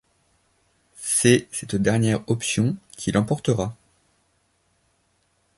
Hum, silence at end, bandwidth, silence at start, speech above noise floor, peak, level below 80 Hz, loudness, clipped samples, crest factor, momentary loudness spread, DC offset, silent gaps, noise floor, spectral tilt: none; 1.85 s; 12 kHz; 1 s; 46 dB; 0 dBFS; -52 dBFS; -22 LUFS; under 0.1%; 24 dB; 10 LU; under 0.1%; none; -67 dBFS; -5 dB/octave